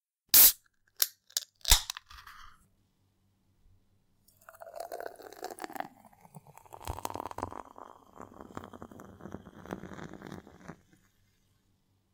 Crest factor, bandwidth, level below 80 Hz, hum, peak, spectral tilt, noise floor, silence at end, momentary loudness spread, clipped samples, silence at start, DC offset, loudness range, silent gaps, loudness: 28 dB; 18 kHz; -48 dBFS; none; -8 dBFS; -0.5 dB/octave; -72 dBFS; 1.4 s; 28 LU; under 0.1%; 0.35 s; under 0.1%; 18 LU; none; -24 LUFS